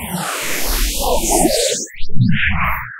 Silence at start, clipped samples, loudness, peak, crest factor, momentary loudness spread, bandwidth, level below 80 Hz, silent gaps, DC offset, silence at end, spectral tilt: 0 s; under 0.1%; -17 LUFS; 0 dBFS; 14 dB; 7 LU; 16 kHz; -24 dBFS; none; under 0.1%; 0 s; -3.5 dB/octave